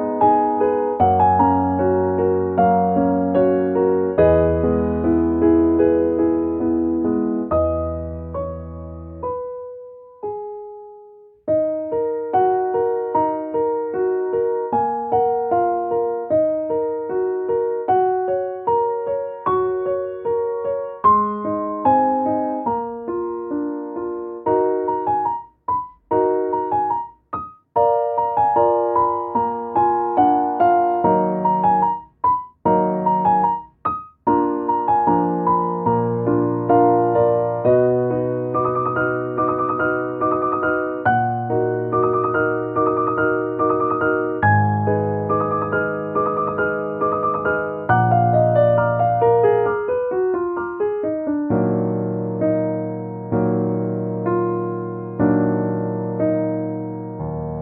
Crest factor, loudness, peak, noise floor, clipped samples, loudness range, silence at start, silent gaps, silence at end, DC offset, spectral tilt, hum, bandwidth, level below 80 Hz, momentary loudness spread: 16 dB; -19 LUFS; -2 dBFS; -45 dBFS; under 0.1%; 5 LU; 0 s; none; 0 s; under 0.1%; -8.5 dB/octave; none; 3.8 kHz; -46 dBFS; 9 LU